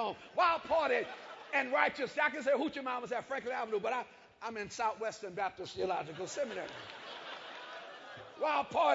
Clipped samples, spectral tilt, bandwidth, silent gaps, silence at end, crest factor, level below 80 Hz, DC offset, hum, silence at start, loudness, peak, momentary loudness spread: under 0.1%; -1 dB/octave; 7.6 kHz; none; 0 s; 22 dB; -74 dBFS; under 0.1%; none; 0 s; -35 LUFS; -14 dBFS; 15 LU